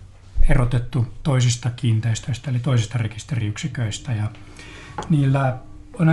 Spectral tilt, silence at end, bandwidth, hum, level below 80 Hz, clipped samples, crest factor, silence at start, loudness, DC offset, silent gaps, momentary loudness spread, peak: -6 dB/octave; 0 s; 11.5 kHz; none; -28 dBFS; under 0.1%; 18 dB; 0 s; -22 LUFS; under 0.1%; none; 15 LU; -2 dBFS